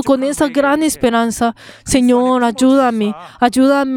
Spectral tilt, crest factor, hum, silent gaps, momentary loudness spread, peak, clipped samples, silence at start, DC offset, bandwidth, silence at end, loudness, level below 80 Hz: -4 dB/octave; 14 dB; none; none; 7 LU; 0 dBFS; under 0.1%; 0 s; under 0.1%; 16.5 kHz; 0 s; -14 LUFS; -42 dBFS